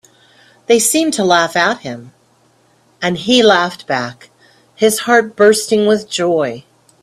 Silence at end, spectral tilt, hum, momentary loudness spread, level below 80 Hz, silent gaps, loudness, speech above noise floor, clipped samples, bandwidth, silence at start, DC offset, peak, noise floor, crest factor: 0.45 s; -3 dB/octave; none; 13 LU; -58 dBFS; none; -13 LUFS; 40 dB; under 0.1%; 15.5 kHz; 0.7 s; under 0.1%; 0 dBFS; -54 dBFS; 16 dB